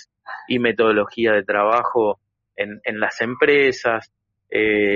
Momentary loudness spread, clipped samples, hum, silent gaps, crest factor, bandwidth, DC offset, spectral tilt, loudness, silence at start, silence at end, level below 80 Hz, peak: 12 LU; under 0.1%; none; none; 16 dB; 7.4 kHz; under 0.1%; -2.5 dB/octave; -19 LUFS; 0.25 s; 0 s; -58 dBFS; -4 dBFS